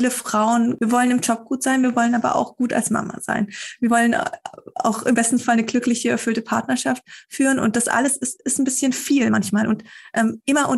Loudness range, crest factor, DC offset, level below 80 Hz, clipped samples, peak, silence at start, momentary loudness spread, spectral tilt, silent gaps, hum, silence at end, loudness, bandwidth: 1 LU; 14 dB; under 0.1%; -64 dBFS; under 0.1%; -6 dBFS; 0 s; 7 LU; -3.5 dB/octave; none; none; 0 s; -20 LUFS; 13 kHz